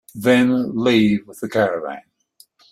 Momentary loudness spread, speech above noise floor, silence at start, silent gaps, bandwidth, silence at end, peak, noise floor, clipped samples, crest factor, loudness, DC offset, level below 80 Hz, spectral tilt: 12 LU; 37 dB; 0.15 s; none; 14.5 kHz; 0.7 s; -2 dBFS; -54 dBFS; under 0.1%; 16 dB; -18 LUFS; under 0.1%; -58 dBFS; -6 dB/octave